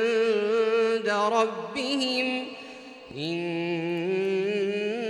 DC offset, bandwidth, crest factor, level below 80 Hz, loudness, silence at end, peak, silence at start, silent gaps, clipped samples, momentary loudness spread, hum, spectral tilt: under 0.1%; 11.5 kHz; 16 dB; -74 dBFS; -26 LUFS; 0 s; -12 dBFS; 0 s; none; under 0.1%; 12 LU; none; -4.5 dB/octave